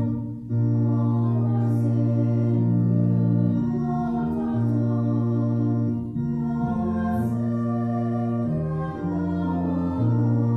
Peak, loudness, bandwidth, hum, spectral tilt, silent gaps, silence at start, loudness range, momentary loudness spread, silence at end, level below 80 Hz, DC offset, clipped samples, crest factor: -12 dBFS; -24 LUFS; 3.3 kHz; none; -11.5 dB/octave; none; 0 s; 3 LU; 5 LU; 0 s; -48 dBFS; under 0.1%; under 0.1%; 12 dB